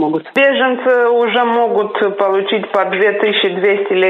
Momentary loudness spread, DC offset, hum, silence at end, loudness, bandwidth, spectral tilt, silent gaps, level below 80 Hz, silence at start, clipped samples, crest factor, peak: 4 LU; under 0.1%; none; 0 s; -14 LUFS; 4.9 kHz; -6 dB/octave; none; -84 dBFS; 0 s; under 0.1%; 12 dB; 0 dBFS